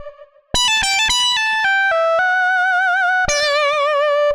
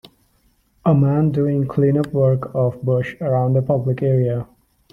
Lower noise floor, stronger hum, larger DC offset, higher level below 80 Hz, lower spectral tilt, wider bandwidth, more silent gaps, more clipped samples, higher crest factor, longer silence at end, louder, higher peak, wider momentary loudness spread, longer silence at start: second, -39 dBFS vs -60 dBFS; neither; neither; first, -40 dBFS vs -52 dBFS; second, 0 dB/octave vs -10.5 dB/octave; first, 16 kHz vs 5 kHz; neither; neither; about the same, 14 dB vs 14 dB; second, 0 s vs 0.5 s; first, -15 LUFS vs -19 LUFS; about the same, -2 dBFS vs -4 dBFS; second, 2 LU vs 5 LU; second, 0 s vs 0.85 s